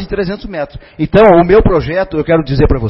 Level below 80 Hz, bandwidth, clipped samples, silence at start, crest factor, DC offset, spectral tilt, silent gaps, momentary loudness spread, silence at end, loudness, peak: -22 dBFS; 5.8 kHz; 0.2%; 0 s; 10 dB; under 0.1%; -10 dB/octave; none; 15 LU; 0 s; -11 LUFS; 0 dBFS